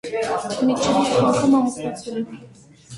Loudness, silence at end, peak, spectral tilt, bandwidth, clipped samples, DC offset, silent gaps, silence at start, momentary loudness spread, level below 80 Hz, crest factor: -20 LUFS; 0 s; -6 dBFS; -5 dB/octave; 11.5 kHz; under 0.1%; under 0.1%; none; 0.05 s; 12 LU; -54 dBFS; 16 dB